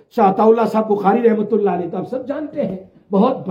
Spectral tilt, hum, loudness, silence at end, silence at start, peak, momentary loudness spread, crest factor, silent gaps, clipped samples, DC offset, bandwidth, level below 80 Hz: -9 dB/octave; none; -17 LUFS; 0 s; 0.15 s; -2 dBFS; 11 LU; 16 dB; none; under 0.1%; under 0.1%; 14.5 kHz; -64 dBFS